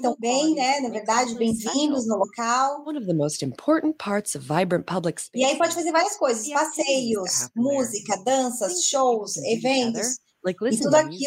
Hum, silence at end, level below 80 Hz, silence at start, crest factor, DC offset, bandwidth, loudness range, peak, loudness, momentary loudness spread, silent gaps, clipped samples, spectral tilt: none; 0 s; -66 dBFS; 0 s; 18 dB; under 0.1%; 16 kHz; 2 LU; -6 dBFS; -23 LUFS; 6 LU; none; under 0.1%; -3.5 dB/octave